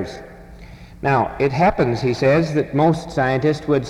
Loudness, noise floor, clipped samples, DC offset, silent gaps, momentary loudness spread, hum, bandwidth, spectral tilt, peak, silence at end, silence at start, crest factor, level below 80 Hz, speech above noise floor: -18 LUFS; -39 dBFS; under 0.1%; under 0.1%; none; 4 LU; none; 12 kHz; -7 dB/octave; -4 dBFS; 0 s; 0 s; 16 dB; -42 dBFS; 21 dB